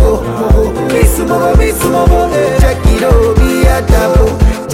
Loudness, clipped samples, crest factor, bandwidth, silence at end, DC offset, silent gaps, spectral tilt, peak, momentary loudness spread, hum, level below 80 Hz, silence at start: -10 LUFS; under 0.1%; 8 dB; 16.5 kHz; 0 s; under 0.1%; none; -6 dB/octave; 0 dBFS; 3 LU; none; -12 dBFS; 0 s